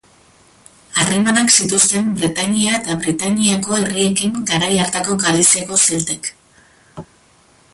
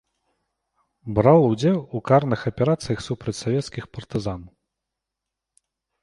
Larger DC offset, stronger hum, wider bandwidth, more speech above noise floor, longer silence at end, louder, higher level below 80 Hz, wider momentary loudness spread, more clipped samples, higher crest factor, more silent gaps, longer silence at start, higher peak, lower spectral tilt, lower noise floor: neither; neither; about the same, 12 kHz vs 11.5 kHz; second, 35 dB vs 64 dB; second, 0.7 s vs 1.55 s; first, -15 LUFS vs -22 LUFS; about the same, -52 dBFS vs -50 dBFS; second, 8 LU vs 16 LU; neither; about the same, 18 dB vs 20 dB; neither; second, 0.9 s vs 1.05 s; about the same, 0 dBFS vs -2 dBFS; second, -2.5 dB/octave vs -7 dB/octave; second, -51 dBFS vs -85 dBFS